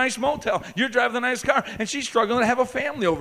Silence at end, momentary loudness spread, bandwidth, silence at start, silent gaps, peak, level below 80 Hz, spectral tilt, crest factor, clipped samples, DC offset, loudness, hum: 0 s; 5 LU; 15.5 kHz; 0 s; none; -4 dBFS; -54 dBFS; -3.5 dB/octave; 18 dB; under 0.1%; under 0.1%; -23 LUFS; none